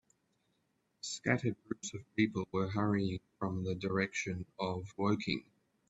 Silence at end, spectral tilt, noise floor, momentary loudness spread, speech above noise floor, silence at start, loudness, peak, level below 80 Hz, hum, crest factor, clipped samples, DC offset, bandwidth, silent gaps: 0.5 s; -5.5 dB/octave; -79 dBFS; 8 LU; 43 dB; 1.05 s; -36 LUFS; -14 dBFS; -68 dBFS; none; 22 dB; under 0.1%; under 0.1%; 8.2 kHz; none